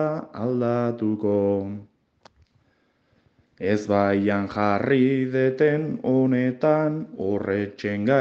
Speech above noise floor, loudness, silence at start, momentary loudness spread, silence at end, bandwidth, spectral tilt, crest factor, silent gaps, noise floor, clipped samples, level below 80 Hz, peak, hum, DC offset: 44 dB; -23 LUFS; 0 s; 7 LU; 0 s; 7.4 kHz; -8.5 dB/octave; 18 dB; none; -66 dBFS; under 0.1%; -66 dBFS; -6 dBFS; none; under 0.1%